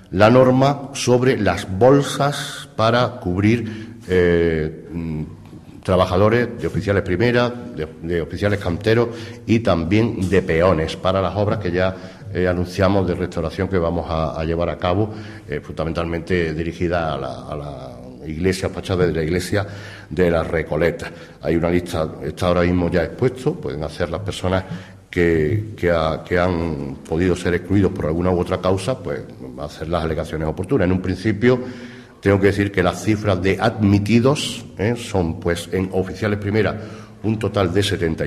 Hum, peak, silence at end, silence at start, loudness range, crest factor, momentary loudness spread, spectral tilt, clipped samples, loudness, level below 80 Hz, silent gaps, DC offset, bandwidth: none; -2 dBFS; 0 s; 0.1 s; 4 LU; 18 dB; 13 LU; -6.5 dB/octave; under 0.1%; -20 LUFS; -36 dBFS; none; under 0.1%; 14.5 kHz